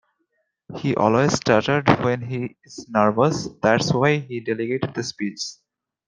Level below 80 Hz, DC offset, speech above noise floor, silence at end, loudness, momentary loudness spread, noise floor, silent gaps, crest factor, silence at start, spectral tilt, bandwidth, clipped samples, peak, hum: -56 dBFS; under 0.1%; 52 dB; 0.55 s; -21 LUFS; 12 LU; -72 dBFS; none; 20 dB; 0.7 s; -5.5 dB/octave; 9.8 kHz; under 0.1%; -2 dBFS; none